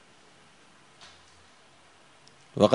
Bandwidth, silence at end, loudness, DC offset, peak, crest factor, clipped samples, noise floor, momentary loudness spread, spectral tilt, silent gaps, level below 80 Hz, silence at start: 10.5 kHz; 0 s; -28 LUFS; under 0.1%; -2 dBFS; 28 dB; under 0.1%; -58 dBFS; 13 LU; -6.5 dB/octave; none; -72 dBFS; 2.55 s